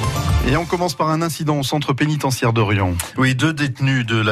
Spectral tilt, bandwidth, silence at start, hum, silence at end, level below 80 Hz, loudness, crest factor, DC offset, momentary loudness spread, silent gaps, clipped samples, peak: -5.5 dB/octave; 14 kHz; 0 s; none; 0 s; -32 dBFS; -19 LUFS; 14 dB; under 0.1%; 3 LU; none; under 0.1%; -4 dBFS